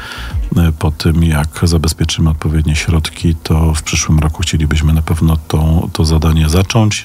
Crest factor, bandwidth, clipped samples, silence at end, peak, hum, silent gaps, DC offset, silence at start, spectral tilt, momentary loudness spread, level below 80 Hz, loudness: 10 dB; 15.5 kHz; under 0.1%; 0 s; -2 dBFS; none; none; under 0.1%; 0 s; -5.5 dB/octave; 3 LU; -18 dBFS; -13 LUFS